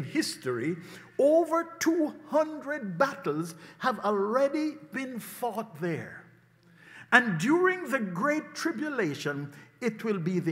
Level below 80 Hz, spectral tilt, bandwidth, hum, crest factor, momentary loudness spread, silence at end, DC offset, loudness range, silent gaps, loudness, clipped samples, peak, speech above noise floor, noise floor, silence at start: -80 dBFS; -5 dB/octave; 16 kHz; none; 26 dB; 13 LU; 0 s; under 0.1%; 4 LU; none; -29 LUFS; under 0.1%; -4 dBFS; 31 dB; -59 dBFS; 0 s